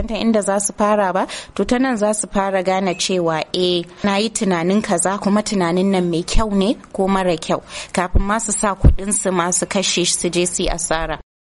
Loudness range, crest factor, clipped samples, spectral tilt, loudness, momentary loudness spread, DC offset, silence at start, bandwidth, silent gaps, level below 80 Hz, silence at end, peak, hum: 1 LU; 18 dB; under 0.1%; -4 dB/octave; -18 LUFS; 5 LU; under 0.1%; 0 s; 11.5 kHz; none; -28 dBFS; 0.3 s; 0 dBFS; none